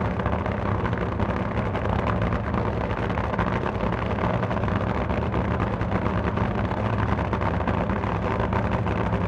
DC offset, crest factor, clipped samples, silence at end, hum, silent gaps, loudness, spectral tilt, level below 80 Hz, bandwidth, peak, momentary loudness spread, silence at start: under 0.1%; 16 dB; under 0.1%; 0 s; none; none; -25 LUFS; -8.5 dB/octave; -34 dBFS; 7.4 kHz; -8 dBFS; 2 LU; 0 s